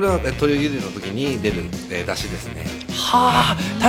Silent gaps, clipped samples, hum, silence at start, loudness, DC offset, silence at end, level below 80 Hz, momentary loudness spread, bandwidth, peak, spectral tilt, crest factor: none; under 0.1%; none; 0 s; -21 LUFS; under 0.1%; 0 s; -36 dBFS; 12 LU; 17 kHz; -2 dBFS; -4.5 dB/octave; 18 dB